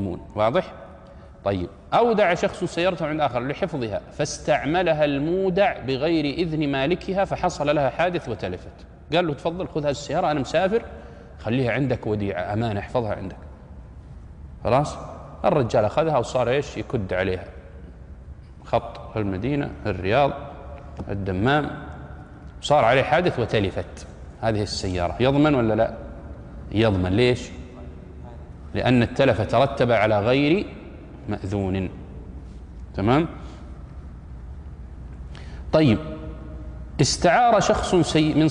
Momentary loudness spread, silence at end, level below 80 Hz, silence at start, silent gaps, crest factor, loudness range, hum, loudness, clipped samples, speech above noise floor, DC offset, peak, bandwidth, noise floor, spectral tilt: 21 LU; 0 s; -42 dBFS; 0 s; none; 16 dB; 6 LU; none; -23 LUFS; under 0.1%; 22 dB; under 0.1%; -6 dBFS; 10.5 kHz; -44 dBFS; -6 dB/octave